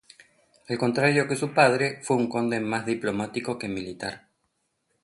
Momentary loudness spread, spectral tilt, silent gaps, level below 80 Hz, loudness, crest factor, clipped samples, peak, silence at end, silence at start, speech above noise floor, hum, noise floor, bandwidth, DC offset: 13 LU; -5 dB/octave; none; -64 dBFS; -25 LUFS; 22 dB; under 0.1%; -4 dBFS; 0.85 s; 0.7 s; 50 dB; none; -75 dBFS; 11.5 kHz; under 0.1%